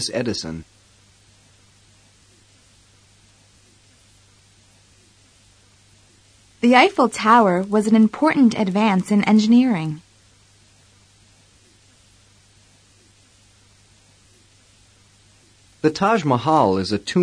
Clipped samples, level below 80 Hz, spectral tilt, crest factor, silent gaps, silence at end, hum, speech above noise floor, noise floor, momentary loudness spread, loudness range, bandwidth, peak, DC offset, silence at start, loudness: under 0.1%; -58 dBFS; -5.5 dB/octave; 20 dB; none; 0 s; none; 37 dB; -54 dBFS; 11 LU; 15 LU; 10.5 kHz; -2 dBFS; under 0.1%; 0 s; -17 LUFS